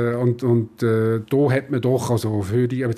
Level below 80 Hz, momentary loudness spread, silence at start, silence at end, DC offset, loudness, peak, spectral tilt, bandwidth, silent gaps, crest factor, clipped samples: -58 dBFS; 3 LU; 0 s; 0 s; under 0.1%; -21 LUFS; -6 dBFS; -7.5 dB/octave; 14.5 kHz; none; 14 dB; under 0.1%